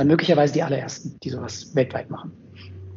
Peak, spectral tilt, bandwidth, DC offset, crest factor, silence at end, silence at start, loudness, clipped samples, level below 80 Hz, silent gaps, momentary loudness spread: -4 dBFS; -5.5 dB/octave; 7.6 kHz; under 0.1%; 18 dB; 0 s; 0 s; -23 LUFS; under 0.1%; -62 dBFS; none; 23 LU